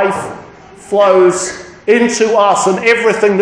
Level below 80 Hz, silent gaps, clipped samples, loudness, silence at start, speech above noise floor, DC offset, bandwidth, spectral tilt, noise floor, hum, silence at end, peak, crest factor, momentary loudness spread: -52 dBFS; none; under 0.1%; -12 LUFS; 0 s; 25 dB; under 0.1%; 10.5 kHz; -4 dB/octave; -35 dBFS; none; 0 s; 0 dBFS; 12 dB; 12 LU